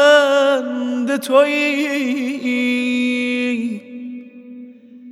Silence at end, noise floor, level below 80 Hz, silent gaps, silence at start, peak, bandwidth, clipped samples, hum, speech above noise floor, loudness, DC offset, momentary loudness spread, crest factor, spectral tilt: 0 s; -39 dBFS; -86 dBFS; none; 0 s; -2 dBFS; 14.5 kHz; under 0.1%; none; 22 dB; -17 LUFS; under 0.1%; 20 LU; 16 dB; -3 dB/octave